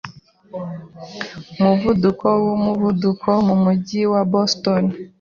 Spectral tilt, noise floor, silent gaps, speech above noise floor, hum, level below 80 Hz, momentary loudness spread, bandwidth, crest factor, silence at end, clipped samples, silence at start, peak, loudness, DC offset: -7 dB/octave; -39 dBFS; none; 21 dB; none; -50 dBFS; 16 LU; 7 kHz; 16 dB; 0.15 s; under 0.1%; 0.05 s; -2 dBFS; -18 LUFS; under 0.1%